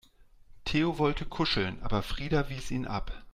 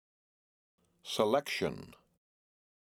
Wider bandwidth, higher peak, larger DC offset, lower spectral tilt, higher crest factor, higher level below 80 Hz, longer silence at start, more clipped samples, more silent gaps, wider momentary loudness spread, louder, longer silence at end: second, 14.5 kHz vs 17.5 kHz; about the same, -14 dBFS vs -12 dBFS; neither; first, -6 dB/octave vs -4 dB/octave; second, 16 dB vs 26 dB; first, -40 dBFS vs -70 dBFS; second, 0.2 s vs 1.05 s; neither; neither; second, 8 LU vs 18 LU; about the same, -31 LUFS vs -33 LUFS; second, 0 s vs 1.1 s